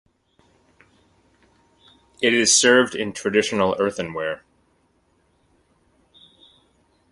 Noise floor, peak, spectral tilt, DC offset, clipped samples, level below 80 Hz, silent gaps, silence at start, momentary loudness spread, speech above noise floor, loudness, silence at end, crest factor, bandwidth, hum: -64 dBFS; -2 dBFS; -2 dB/octave; under 0.1%; under 0.1%; -60 dBFS; none; 2.2 s; 14 LU; 44 dB; -19 LUFS; 2.75 s; 22 dB; 11.5 kHz; none